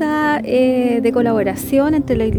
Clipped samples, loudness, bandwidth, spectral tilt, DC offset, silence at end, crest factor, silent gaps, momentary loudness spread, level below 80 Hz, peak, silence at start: under 0.1%; -16 LUFS; over 20 kHz; -6.5 dB/octave; under 0.1%; 0 s; 12 dB; none; 2 LU; -38 dBFS; -4 dBFS; 0 s